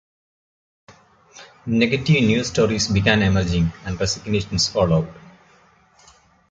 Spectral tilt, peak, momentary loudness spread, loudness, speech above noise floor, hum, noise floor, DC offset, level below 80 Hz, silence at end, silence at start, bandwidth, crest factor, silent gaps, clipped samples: -5 dB/octave; -2 dBFS; 7 LU; -19 LUFS; 36 dB; none; -55 dBFS; under 0.1%; -38 dBFS; 1.2 s; 1.35 s; 9.2 kHz; 20 dB; none; under 0.1%